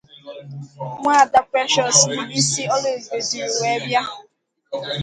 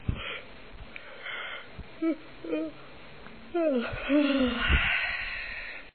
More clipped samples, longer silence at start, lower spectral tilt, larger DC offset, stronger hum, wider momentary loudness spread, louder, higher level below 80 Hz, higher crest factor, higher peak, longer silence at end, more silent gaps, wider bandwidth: neither; first, 0.25 s vs 0 s; second, -2 dB/octave vs -3.5 dB/octave; second, under 0.1% vs 0.4%; neither; about the same, 21 LU vs 22 LU; first, -18 LUFS vs -30 LUFS; second, -62 dBFS vs -40 dBFS; about the same, 20 dB vs 20 dB; first, 0 dBFS vs -12 dBFS; about the same, 0 s vs 0 s; neither; first, 11 kHz vs 4.6 kHz